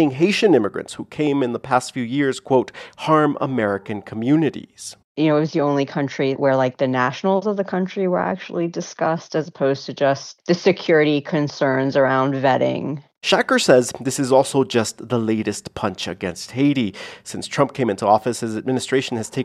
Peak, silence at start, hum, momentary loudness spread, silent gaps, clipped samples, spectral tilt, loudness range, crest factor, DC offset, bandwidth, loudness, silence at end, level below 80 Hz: 0 dBFS; 0 s; none; 10 LU; 5.04-5.15 s; under 0.1%; -5.5 dB/octave; 4 LU; 20 dB; under 0.1%; 13.5 kHz; -20 LUFS; 0 s; -62 dBFS